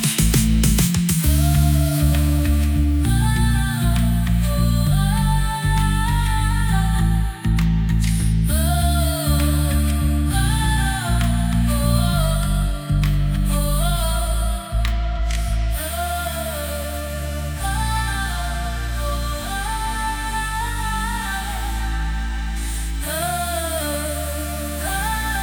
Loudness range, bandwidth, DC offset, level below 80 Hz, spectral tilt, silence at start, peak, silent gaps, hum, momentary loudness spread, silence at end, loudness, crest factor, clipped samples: 6 LU; 19.5 kHz; under 0.1%; -22 dBFS; -5 dB/octave; 0 s; -6 dBFS; none; none; 8 LU; 0 s; -21 LUFS; 14 dB; under 0.1%